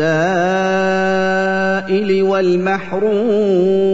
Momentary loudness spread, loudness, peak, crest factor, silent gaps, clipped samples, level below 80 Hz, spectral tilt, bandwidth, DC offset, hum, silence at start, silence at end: 3 LU; -15 LUFS; -4 dBFS; 12 dB; none; under 0.1%; -52 dBFS; -6.5 dB/octave; 7.8 kHz; 1%; none; 0 s; 0 s